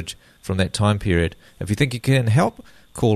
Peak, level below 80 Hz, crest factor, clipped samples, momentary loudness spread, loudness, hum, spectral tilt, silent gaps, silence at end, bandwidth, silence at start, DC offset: -4 dBFS; -40 dBFS; 16 dB; under 0.1%; 16 LU; -21 LUFS; none; -6 dB/octave; none; 0 s; 13.5 kHz; 0 s; under 0.1%